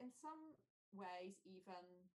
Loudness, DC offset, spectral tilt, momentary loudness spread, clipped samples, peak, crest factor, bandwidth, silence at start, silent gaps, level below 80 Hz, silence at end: -58 LUFS; under 0.1%; -5 dB/octave; 10 LU; under 0.1%; -42 dBFS; 16 dB; 12 kHz; 0 s; 0.70-0.92 s; under -90 dBFS; 0.05 s